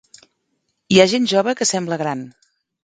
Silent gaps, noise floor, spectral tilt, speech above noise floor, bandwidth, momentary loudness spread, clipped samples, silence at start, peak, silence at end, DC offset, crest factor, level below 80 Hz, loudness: none; -71 dBFS; -4 dB/octave; 54 dB; 9.6 kHz; 14 LU; under 0.1%; 0.9 s; 0 dBFS; 0.55 s; under 0.1%; 20 dB; -60 dBFS; -17 LUFS